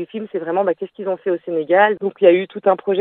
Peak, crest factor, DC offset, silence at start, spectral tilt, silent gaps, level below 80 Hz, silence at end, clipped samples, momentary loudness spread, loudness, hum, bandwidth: 0 dBFS; 18 dB; under 0.1%; 0 s; -9.5 dB/octave; none; -76 dBFS; 0 s; under 0.1%; 11 LU; -18 LUFS; none; 4 kHz